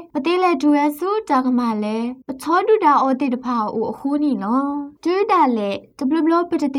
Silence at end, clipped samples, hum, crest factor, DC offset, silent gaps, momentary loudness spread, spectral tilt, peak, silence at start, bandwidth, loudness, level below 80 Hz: 0 s; under 0.1%; none; 16 dB; under 0.1%; none; 9 LU; -6 dB/octave; -4 dBFS; 0 s; 16 kHz; -19 LUFS; -64 dBFS